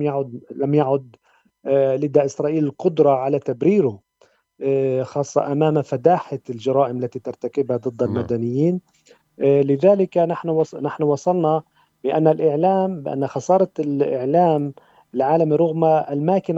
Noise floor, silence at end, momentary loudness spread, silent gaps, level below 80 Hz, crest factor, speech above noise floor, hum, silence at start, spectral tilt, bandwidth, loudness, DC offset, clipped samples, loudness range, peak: -59 dBFS; 0 s; 8 LU; none; -68 dBFS; 18 dB; 40 dB; none; 0 s; -8 dB/octave; 8 kHz; -20 LUFS; under 0.1%; under 0.1%; 2 LU; -2 dBFS